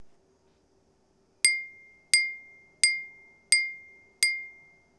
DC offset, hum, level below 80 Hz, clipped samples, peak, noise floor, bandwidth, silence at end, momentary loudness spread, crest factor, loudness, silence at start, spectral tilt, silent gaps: under 0.1%; none; -76 dBFS; under 0.1%; -4 dBFS; -67 dBFS; 11 kHz; 0.5 s; 20 LU; 26 dB; -25 LUFS; 0 s; 4.5 dB/octave; none